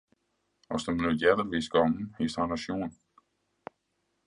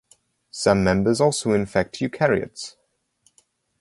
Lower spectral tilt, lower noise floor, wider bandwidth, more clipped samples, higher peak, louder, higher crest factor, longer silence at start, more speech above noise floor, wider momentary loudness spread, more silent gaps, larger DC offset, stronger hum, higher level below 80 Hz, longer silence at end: about the same, -5.5 dB/octave vs -5 dB/octave; first, -78 dBFS vs -65 dBFS; about the same, 11 kHz vs 11.5 kHz; neither; second, -8 dBFS vs -2 dBFS; second, -29 LUFS vs -21 LUFS; about the same, 22 dB vs 20 dB; first, 0.7 s vs 0.55 s; first, 49 dB vs 44 dB; first, 24 LU vs 16 LU; neither; neither; neither; second, -56 dBFS vs -48 dBFS; first, 1.35 s vs 1.1 s